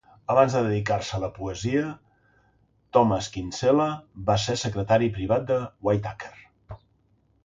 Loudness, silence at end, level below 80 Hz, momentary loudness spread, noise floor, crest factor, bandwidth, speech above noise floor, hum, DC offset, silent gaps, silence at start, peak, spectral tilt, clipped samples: -25 LUFS; 0.7 s; -50 dBFS; 11 LU; -65 dBFS; 22 dB; 9.2 kHz; 41 dB; none; under 0.1%; none; 0.3 s; -4 dBFS; -6 dB/octave; under 0.1%